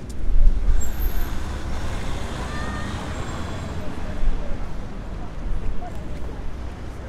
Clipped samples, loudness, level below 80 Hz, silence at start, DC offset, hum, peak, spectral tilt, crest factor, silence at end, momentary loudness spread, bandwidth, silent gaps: under 0.1%; -30 LUFS; -24 dBFS; 0 s; under 0.1%; none; -2 dBFS; -5.5 dB/octave; 18 dB; 0 s; 10 LU; 13.5 kHz; none